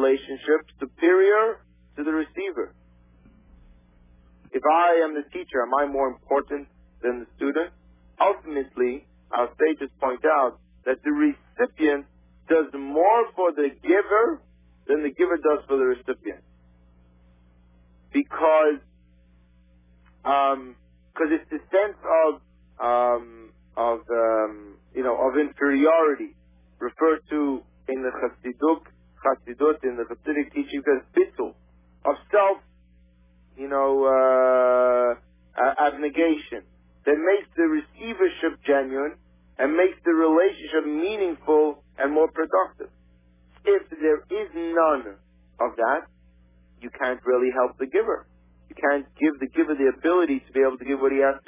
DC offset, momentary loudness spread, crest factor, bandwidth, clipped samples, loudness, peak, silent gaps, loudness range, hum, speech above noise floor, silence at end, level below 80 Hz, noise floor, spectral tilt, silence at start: under 0.1%; 13 LU; 16 dB; 3.8 kHz; under 0.1%; -23 LUFS; -8 dBFS; none; 5 LU; none; 34 dB; 0.1 s; -58 dBFS; -57 dBFS; -8.5 dB/octave; 0 s